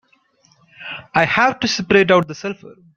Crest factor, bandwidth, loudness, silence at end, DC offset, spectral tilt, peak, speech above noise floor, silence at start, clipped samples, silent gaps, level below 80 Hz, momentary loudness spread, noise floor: 18 dB; 7.6 kHz; -16 LUFS; 0.25 s; under 0.1%; -4.5 dB/octave; -2 dBFS; 41 dB; 0.8 s; under 0.1%; none; -54 dBFS; 18 LU; -58 dBFS